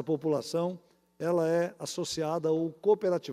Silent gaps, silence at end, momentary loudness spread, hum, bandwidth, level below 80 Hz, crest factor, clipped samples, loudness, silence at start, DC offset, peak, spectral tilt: none; 0 s; 8 LU; none; 15 kHz; -74 dBFS; 16 dB; under 0.1%; -30 LUFS; 0 s; under 0.1%; -14 dBFS; -5.5 dB/octave